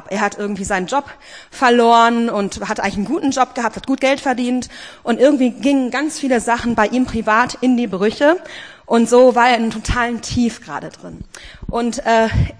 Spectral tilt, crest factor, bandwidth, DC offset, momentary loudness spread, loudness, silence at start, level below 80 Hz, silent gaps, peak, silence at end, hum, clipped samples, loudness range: -5 dB/octave; 16 dB; 10.5 kHz; 0.2%; 17 LU; -16 LUFS; 0.05 s; -36 dBFS; none; 0 dBFS; 0.1 s; none; under 0.1%; 3 LU